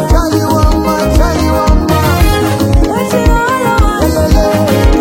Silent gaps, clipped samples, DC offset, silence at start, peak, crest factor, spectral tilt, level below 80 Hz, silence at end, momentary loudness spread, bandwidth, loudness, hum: none; 0.2%; under 0.1%; 0 s; 0 dBFS; 8 dB; -6 dB/octave; -14 dBFS; 0 s; 1 LU; 17 kHz; -11 LUFS; none